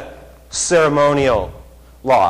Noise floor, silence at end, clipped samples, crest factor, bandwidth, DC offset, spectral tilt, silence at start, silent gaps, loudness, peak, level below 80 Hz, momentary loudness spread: -38 dBFS; 0 s; under 0.1%; 12 dB; 14 kHz; under 0.1%; -4 dB/octave; 0 s; none; -16 LUFS; -6 dBFS; -40 dBFS; 16 LU